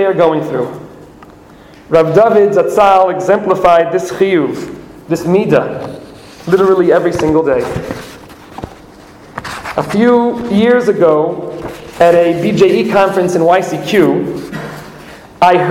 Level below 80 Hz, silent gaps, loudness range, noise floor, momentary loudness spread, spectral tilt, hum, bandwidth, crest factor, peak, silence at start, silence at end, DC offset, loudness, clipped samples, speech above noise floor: -44 dBFS; none; 4 LU; -38 dBFS; 19 LU; -6.5 dB/octave; none; 16 kHz; 12 dB; 0 dBFS; 0 s; 0 s; under 0.1%; -11 LUFS; under 0.1%; 27 dB